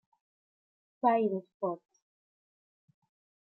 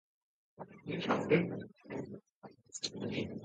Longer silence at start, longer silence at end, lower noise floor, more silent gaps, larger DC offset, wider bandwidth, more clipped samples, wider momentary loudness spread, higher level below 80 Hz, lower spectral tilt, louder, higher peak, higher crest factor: first, 1.05 s vs 0.6 s; first, 1.65 s vs 0 s; first, under -90 dBFS vs -58 dBFS; about the same, 1.54-1.60 s vs 2.32-2.42 s; neither; second, 6 kHz vs 9 kHz; neither; second, 9 LU vs 22 LU; second, under -90 dBFS vs -70 dBFS; first, -9 dB/octave vs -5 dB/octave; first, -31 LUFS vs -37 LUFS; about the same, -14 dBFS vs -16 dBFS; about the same, 22 dB vs 22 dB